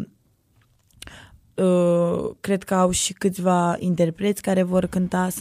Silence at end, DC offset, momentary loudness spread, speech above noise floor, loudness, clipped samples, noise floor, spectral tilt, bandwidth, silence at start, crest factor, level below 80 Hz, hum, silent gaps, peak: 0 s; under 0.1%; 15 LU; 40 dB; -22 LUFS; under 0.1%; -61 dBFS; -5.5 dB/octave; 15.5 kHz; 0 s; 14 dB; -50 dBFS; none; none; -8 dBFS